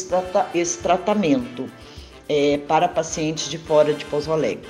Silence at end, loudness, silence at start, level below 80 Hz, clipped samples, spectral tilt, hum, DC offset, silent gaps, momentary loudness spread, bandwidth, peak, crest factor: 0 s; -21 LUFS; 0 s; -50 dBFS; under 0.1%; -4.5 dB/octave; none; under 0.1%; none; 15 LU; 12.5 kHz; -4 dBFS; 16 dB